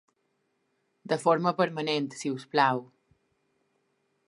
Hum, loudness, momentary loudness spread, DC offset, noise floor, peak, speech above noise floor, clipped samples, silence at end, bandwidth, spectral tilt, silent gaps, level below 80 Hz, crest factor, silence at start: none; -28 LUFS; 8 LU; under 0.1%; -76 dBFS; -8 dBFS; 48 dB; under 0.1%; 1.45 s; 11.5 kHz; -5 dB/octave; none; -80 dBFS; 22 dB; 1.05 s